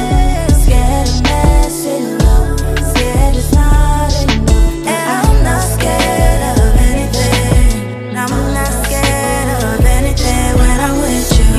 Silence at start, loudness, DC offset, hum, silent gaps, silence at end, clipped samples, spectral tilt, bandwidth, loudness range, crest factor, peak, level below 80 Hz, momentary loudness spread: 0 s; -13 LUFS; under 0.1%; none; none; 0 s; under 0.1%; -5 dB/octave; 15 kHz; 1 LU; 10 dB; 0 dBFS; -12 dBFS; 4 LU